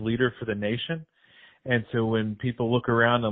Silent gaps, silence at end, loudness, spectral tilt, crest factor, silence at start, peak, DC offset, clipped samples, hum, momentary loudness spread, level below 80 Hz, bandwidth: none; 0 s; -26 LUFS; -4.5 dB/octave; 18 dB; 0 s; -8 dBFS; under 0.1%; under 0.1%; none; 10 LU; -58 dBFS; 4 kHz